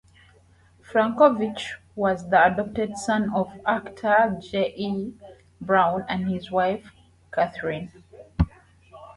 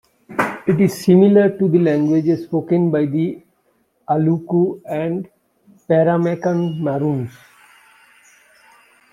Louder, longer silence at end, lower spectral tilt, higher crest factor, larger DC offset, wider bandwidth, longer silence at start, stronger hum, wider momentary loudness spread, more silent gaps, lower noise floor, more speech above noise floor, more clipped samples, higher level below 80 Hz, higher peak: second, -24 LUFS vs -17 LUFS; second, 0.05 s vs 1.85 s; second, -6 dB/octave vs -8.5 dB/octave; first, 22 dB vs 16 dB; neither; second, 11.5 kHz vs 14.5 kHz; first, 0.9 s vs 0.3 s; neither; first, 14 LU vs 11 LU; neither; second, -56 dBFS vs -63 dBFS; second, 33 dB vs 47 dB; neither; first, -44 dBFS vs -60 dBFS; about the same, -4 dBFS vs -2 dBFS